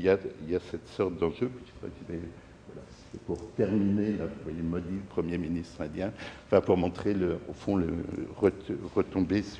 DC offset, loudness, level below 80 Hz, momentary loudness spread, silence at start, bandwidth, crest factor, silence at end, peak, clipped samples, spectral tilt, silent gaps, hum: under 0.1%; -31 LUFS; -52 dBFS; 16 LU; 0 s; 10 kHz; 22 dB; 0 s; -8 dBFS; under 0.1%; -8 dB/octave; none; none